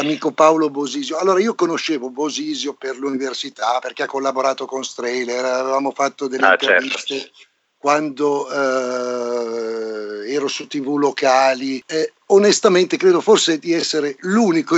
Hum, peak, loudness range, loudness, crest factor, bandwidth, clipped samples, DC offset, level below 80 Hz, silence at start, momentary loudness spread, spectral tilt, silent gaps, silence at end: none; 0 dBFS; 6 LU; -18 LUFS; 18 dB; 8.4 kHz; under 0.1%; under 0.1%; -86 dBFS; 0 s; 10 LU; -3.5 dB/octave; none; 0 s